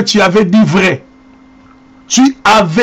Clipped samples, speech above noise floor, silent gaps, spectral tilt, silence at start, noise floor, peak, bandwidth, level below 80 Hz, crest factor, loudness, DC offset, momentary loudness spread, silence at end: under 0.1%; 32 dB; none; -4.5 dB/octave; 0 s; -41 dBFS; -2 dBFS; 15 kHz; -44 dBFS; 10 dB; -9 LUFS; under 0.1%; 5 LU; 0 s